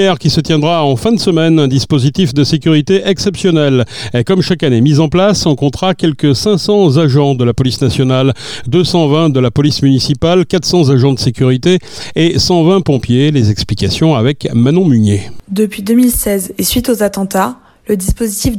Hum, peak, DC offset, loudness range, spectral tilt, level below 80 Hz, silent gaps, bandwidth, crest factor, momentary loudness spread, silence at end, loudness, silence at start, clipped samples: none; 0 dBFS; under 0.1%; 1 LU; -6 dB/octave; -34 dBFS; none; 17.5 kHz; 10 dB; 5 LU; 0 s; -11 LUFS; 0 s; under 0.1%